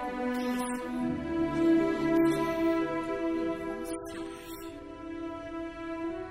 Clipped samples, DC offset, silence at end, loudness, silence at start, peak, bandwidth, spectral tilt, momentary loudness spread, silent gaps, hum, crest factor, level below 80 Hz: under 0.1%; under 0.1%; 0 s; -31 LUFS; 0 s; -14 dBFS; 16 kHz; -6 dB/octave; 15 LU; none; none; 16 dB; -54 dBFS